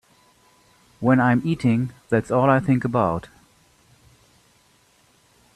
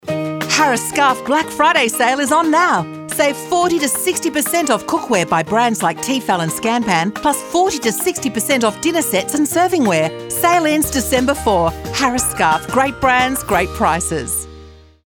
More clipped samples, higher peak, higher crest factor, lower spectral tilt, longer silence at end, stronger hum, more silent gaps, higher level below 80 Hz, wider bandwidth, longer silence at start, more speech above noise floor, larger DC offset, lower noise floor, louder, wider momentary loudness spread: neither; about the same, -4 dBFS vs -2 dBFS; first, 20 dB vs 14 dB; first, -8.5 dB/octave vs -3.5 dB/octave; first, 2.35 s vs 0.3 s; neither; neither; second, -56 dBFS vs -40 dBFS; second, 11.5 kHz vs over 20 kHz; first, 1 s vs 0.05 s; first, 39 dB vs 24 dB; neither; first, -59 dBFS vs -40 dBFS; second, -21 LUFS vs -16 LUFS; about the same, 7 LU vs 5 LU